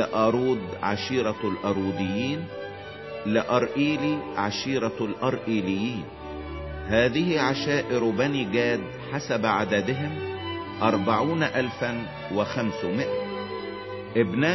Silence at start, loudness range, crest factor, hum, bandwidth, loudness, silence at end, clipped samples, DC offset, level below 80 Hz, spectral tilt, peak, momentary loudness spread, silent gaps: 0 s; 3 LU; 20 dB; none; 6.2 kHz; -26 LUFS; 0 s; under 0.1%; under 0.1%; -50 dBFS; -6 dB/octave; -6 dBFS; 11 LU; none